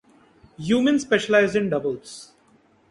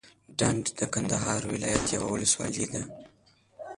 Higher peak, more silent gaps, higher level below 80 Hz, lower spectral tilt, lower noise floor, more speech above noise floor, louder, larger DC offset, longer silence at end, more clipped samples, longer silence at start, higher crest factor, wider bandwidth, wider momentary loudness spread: first, -6 dBFS vs -10 dBFS; neither; second, -60 dBFS vs -52 dBFS; first, -5 dB/octave vs -3.5 dB/octave; first, -59 dBFS vs -55 dBFS; first, 37 dB vs 26 dB; first, -21 LUFS vs -28 LUFS; neither; first, 0.65 s vs 0 s; neither; first, 0.6 s vs 0.05 s; about the same, 18 dB vs 20 dB; about the same, 11.5 kHz vs 11.5 kHz; first, 17 LU vs 11 LU